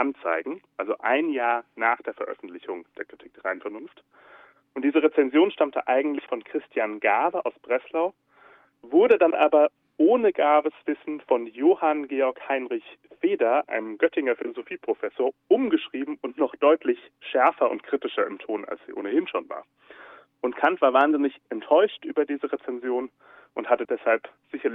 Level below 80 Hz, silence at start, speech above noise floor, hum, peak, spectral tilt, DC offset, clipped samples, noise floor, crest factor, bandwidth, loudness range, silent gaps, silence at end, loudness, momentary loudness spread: -78 dBFS; 0 s; 31 dB; none; -6 dBFS; -7 dB/octave; under 0.1%; under 0.1%; -56 dBFS; 18 dB; 3.9 kHz; 6 LU; none; 0 s; -24 LUFS; 14 LU